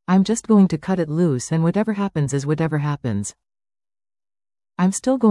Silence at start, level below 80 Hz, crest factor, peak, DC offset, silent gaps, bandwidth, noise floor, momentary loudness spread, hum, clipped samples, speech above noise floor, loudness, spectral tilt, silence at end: 0.1 s; -56 dBFS; 16 dB; -4 dBFS; under 0.1%; none; 12 kHz; under -90 dBFS; 9 LU; none; under 0.1%; over 71 dB; -20 LUFS; -6.5 dB/octave; 0 s